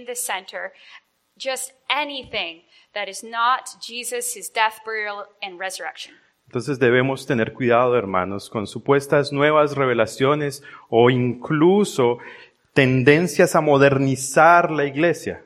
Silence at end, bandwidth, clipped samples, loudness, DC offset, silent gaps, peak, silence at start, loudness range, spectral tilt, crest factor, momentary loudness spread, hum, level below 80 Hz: 0.1 s; 16 kHz; under 0.1%; -20 LUFS; under 0.1%; none; 0 dBFS; 0 s; 9 LU; -5 dB/octave; 20 dB; 15 LU; none; -60 dBFS